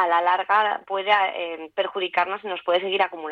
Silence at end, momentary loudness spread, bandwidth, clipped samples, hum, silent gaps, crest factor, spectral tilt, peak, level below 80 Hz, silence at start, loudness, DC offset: 0 s; 8 LU; 6.2 kHz; under 0.1%; none; none; 16 dB; -4.5 dB/octave; -6 dBFS; -74 dBFS; 0 s; -23 LUFS; under 0.1%